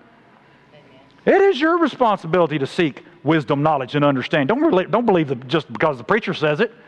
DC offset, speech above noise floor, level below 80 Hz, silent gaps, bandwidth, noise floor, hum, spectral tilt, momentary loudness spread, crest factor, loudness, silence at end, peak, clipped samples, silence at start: under 0.1%; 33 dB; -58 dBFS; none; 9.6 kHz; -51 dBFS; none; -7 dB/octave; 6 LU; 18 dB; -19 LUFS; 0.2 s; -2 dBFS; under 0.1%; 1.25 s